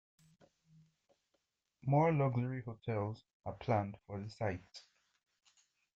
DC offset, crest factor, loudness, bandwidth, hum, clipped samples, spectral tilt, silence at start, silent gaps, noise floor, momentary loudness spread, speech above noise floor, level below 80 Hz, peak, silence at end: under 0.1%; 20 dB; -37 LUFS; 7.8 kHz; none; under 0.1%; -8.5 dB/octave; 1.85 s; 3.33-3.40 s; -84 dBFS; 16 LU; 48 dB; -70 dBFS; -20 dBFS; 1.15 s